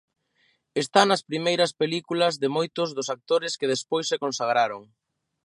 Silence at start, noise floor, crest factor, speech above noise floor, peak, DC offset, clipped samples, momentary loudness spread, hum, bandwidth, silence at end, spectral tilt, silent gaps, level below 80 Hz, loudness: 0.75 s; -68 dBFS; 22 dB; 44 dB; -4 dBFS; under 0.1%; under 0.1%; 8 LU; none; 11.5 kHz; 0.6 s; -3.5 dB/octave; none; -76 dBFS; -25 LUFS